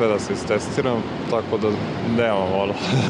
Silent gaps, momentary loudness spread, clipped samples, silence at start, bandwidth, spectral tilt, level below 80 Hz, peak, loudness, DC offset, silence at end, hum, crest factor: none; 4 LU; under 0.1%; 0 s; 11 kHz; -6 dB/octave; -50 dBFS; -6 dBFS; -22 LUFS; under 0.1%; 0 s; none; 14 dB